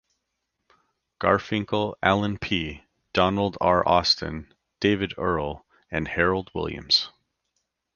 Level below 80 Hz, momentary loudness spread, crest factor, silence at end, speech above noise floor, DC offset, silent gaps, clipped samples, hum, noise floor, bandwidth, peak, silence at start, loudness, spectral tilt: -46 dBFS; 12 LU; 22 dB; 0.85 s; 55 dB; under 0.1%; none; under 0.1%; none; -79 dBFS; 7.2 kHz; -4 dBFS; 1.2 s; -24 LUFS; -5 dB/octave